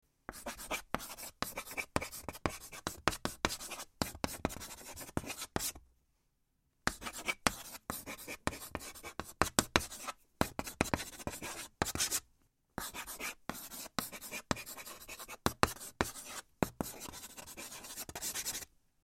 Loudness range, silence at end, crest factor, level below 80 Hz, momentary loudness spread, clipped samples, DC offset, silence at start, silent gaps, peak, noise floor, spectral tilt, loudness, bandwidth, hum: 4 LU; 0.4 s; 36 dB; -56 dBFS; 12 LU; under 0.1%; under 0.1%; 0.3 s; none; -4 dBFS; -78 dBFS; -2.5 dB/octave; -39 LUFS; 16.5 kHz; none